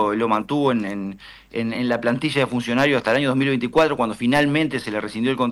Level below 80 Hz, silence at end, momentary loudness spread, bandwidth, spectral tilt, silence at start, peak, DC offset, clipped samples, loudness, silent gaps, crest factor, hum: -54 dBFS; 0 s; 9 LU; 13 kHz; -6 dB/octave; 0 s; -8 dBFS; under 0.1%; under 0.1%; -21 LUFS; none; 14 dB; none